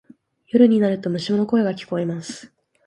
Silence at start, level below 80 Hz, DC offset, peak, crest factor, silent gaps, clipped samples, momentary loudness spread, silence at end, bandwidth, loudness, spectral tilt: 0.55 s; -66 dBFS; under 0.1%; -2 dBFS; 18 dB; none; under 0.1%; 15 LU; 0.4 s; 10.5 kHz; -20 LUFS; -7 dB/octave